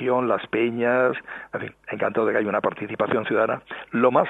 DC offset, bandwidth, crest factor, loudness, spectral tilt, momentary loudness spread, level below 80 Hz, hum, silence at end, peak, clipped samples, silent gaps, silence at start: under 0.1%; 4 kHz; 18 dB; -24 LUFS; -8 dB/octave; 12 LU; -66 dBFS; none; 0 s; -4 dBFS; under 0.1%; none; 0 s